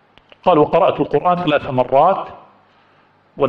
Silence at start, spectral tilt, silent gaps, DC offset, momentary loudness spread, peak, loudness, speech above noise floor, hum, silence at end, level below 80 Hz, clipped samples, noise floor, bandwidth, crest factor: 0.45 s; -8.5 dB/octave; none; under 0.1%; 7 LU; -2 dBFS; -16 LUFS; 39 dB; none; 0 s; -52 dBFS; under 0.1%; -54 dBFS; 5.8 kHz; 14 dB